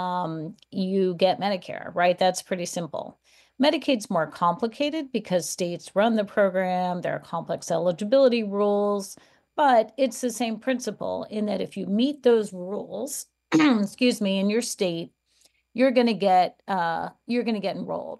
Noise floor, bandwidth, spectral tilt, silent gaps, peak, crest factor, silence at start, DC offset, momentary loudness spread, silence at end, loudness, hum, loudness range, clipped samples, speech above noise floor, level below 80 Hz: -64 dBFS; 12.5 kHz; -5 dB/octave; none; -8 dBFS; 16 dB; 0 s; under 0.1%; 11 LU; 0.05 s; -25 LUFS; none; 3 LU; under 0.1%; 40 dB; -72 dBFS